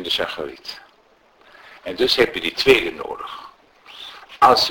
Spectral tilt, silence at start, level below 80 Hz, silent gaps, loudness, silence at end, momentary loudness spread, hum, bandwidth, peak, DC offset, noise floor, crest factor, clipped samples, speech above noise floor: -3 dB/octave; 0 s; -50 dBFS; none; -18 LUFS; 0 s; 21 LU; none; 17 kHz; 0 dBFS; under 0.1%; -56 dBFS; 22 dB; under 0.1%; 37 dB